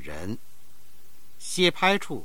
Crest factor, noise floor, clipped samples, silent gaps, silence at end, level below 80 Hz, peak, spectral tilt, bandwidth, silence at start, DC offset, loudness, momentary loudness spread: 22 dB; -58 dBFS; under 0.1%; none; 0 s; -58 dBFS; -6 dBFS; -3.5 dB/octave; 19 kHz; 0 s; 2%; -24 LUFS; 19 LU